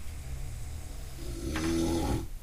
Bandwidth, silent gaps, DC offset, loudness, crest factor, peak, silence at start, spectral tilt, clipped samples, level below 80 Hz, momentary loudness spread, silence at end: 15.5 kHz; none; under 0.1%; -35 LUFS; 14 dB; -18 dBFS; 0 s; -5.5 dB/octave; under 0.1%; -38 dBFS; 13 LU; 0 s